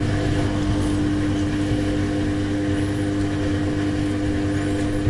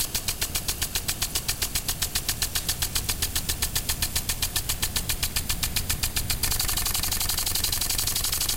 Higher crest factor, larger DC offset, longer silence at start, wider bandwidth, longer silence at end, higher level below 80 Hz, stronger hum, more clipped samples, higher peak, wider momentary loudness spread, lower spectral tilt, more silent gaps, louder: second, 12 dB vs 18 dB; neither; about the same, 0 s vs 0 s; second, 11.5 kHz vs 17 kHz; about the same, 0 s vs 0 s; about the same, -34 dBFS vs -34 dBFS; neither; neither; about the same, -10 dBFS vs -8 dBFS; about the same, 1 LU vs 3 LU; first, -7 dB/octave vs -1 dB/octave; neither; first, -22 LUFS vs -25 LUFS